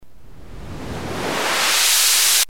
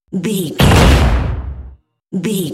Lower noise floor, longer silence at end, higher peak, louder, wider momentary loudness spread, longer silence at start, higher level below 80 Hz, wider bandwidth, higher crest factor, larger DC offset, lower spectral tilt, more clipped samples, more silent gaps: first, -43 dBFS vs -38 dBFS; about the same, 0.05 s vs 0 s; second, -4 dBFS vs 0 dBFS; about the same, -15 LUFS vs -13 LUFS; first, 20 LU vs 16 LU; about the same, 0 s vs 0.1 s; second, -44 dBFS vs -18 dBFS; about the same, 17.5 kHz vs 16 kHz; about the same, 16 dB vs 14 dB; first, 2% vs under 0.1%; second, 0 dB/octave vs -5.5 dB/octave; neither; neither